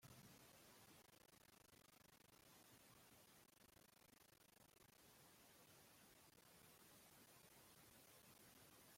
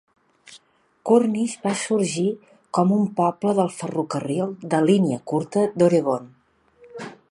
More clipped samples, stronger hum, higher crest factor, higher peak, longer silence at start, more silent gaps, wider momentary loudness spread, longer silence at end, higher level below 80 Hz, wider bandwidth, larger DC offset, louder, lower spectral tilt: neither; neither; about the same, 18 dB vs 18 dB; second, -52 dBFS vs -4 dBFS; second, 0 s vs 0.5 s; neither; second, 3 LU vs 12 LU; second, 0 s vs 0.15 s; second, -88 dBFS vs -68 dBFS; first, 16.5 kHz vs 11.5 kHz; neither; second, -68 LUFS vs -22 LUFS; second, -2.5 dB/octave vs -6.5 dB/octave